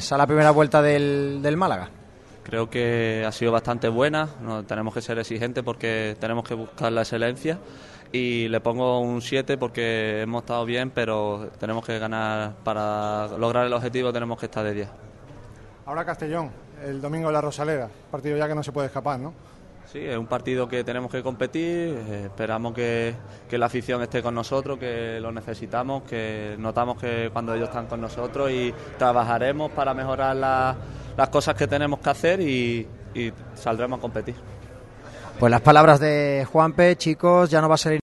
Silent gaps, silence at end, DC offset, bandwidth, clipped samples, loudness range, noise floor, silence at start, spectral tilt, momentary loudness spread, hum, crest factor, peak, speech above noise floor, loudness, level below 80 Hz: none; 0 s; under 0.1%; 12 kHz; under 0.1%; 9 LU; -44 dBFS; 0 s; -6 dB/octave; 14 LU; none; 24 dB; 0 dBFS; 21 dB; -24 LUFS; -50 dBFS